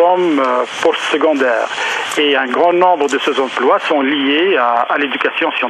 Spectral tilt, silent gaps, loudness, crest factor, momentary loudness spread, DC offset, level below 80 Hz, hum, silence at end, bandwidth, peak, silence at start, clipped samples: -3 dB/octave; none; -14 LUFS; 14 dB; 4 LU; under 0.1%; -70 dBFS; none; 0 s; 13 kHz; 0 dBFS; 0 s; under 0.1%